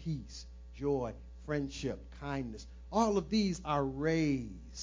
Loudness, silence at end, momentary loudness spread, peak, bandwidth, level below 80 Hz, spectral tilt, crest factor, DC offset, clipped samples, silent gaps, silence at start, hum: -35 LUFS; 0 s; 16 LU; -16 dBFS; 7.6 kHz; -50 dBFS; -6 dB/octave; 18 dB; under 0.1%; under 0.1%; none; 0 s; none